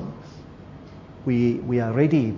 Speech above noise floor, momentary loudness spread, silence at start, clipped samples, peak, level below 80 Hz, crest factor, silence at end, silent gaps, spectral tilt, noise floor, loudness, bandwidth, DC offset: 21 dB; 23 LU; 0 s; under 0.1%; -6 dBFS; -52 dBFS; 18 dB; 0 s; none; -9.5 dB/octave; -42 dBFS; -23 LUFS; 7.2 kHz; under 0.1%